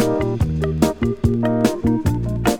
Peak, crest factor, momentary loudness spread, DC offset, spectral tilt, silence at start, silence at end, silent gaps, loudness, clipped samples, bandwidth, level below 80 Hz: -2 dBFS; 18 dB; 2 LU; under 0.1%; -7 dB/octave; 0 s; 0 s; none; -19 LUFS; under 0.1%; 19 kHz; -30 dBFS